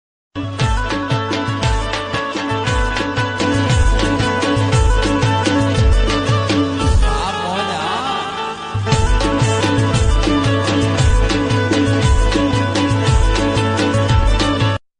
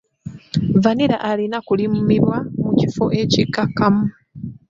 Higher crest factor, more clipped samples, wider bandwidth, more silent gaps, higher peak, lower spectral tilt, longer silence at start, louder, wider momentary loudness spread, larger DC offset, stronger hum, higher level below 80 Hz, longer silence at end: about the same, 12 dB vs 16 dB; neither; first, 10 kHz vs 7.6 kHz; neither; about the same, -4 dBFS vs -2 dBFS; second, -5.5 dB/octave vs -7 dB/octave; about the same, 0.35 s vs 0.25 s; about the same, -16 LUFS vs -18 LUFS; second, 5 LU vs 9 LU; neither; neither; first, -20 dBFS vs -48 dBFS; about the same, 0.25 s vs 0.15 s